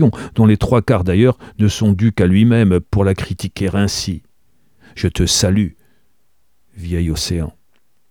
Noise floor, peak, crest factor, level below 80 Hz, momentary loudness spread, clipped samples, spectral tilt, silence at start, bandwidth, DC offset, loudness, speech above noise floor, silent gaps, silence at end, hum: -66 dBFS; 0 dBFS; 16 dB; -34 dBFS; 11 LU; under 0.1%; -6 dB/octave; 0 s; 17 kHz; 0.3%; -16 LUFS; 52 dB; none; 0.6 s; none